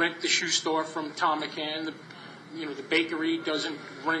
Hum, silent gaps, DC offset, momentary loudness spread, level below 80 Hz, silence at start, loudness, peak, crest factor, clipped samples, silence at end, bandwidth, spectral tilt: none; none; under 0.1%; 15 LU; -82 dBFS; 0 s; -28 LUFS; -10 dBFS; 20 dB; under 0.1%; 0 s; 9.2 kHz; -2 dB/octave